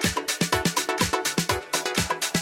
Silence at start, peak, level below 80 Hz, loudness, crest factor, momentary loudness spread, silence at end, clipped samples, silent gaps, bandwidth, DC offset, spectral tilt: 0 s; -8 dBFS; -46 dBFS; -24 LUFS; 18 dB; 2 LU; 0 s; under 0.1%; none; 16.5 kHz; under 0.1%; -3 dB/octave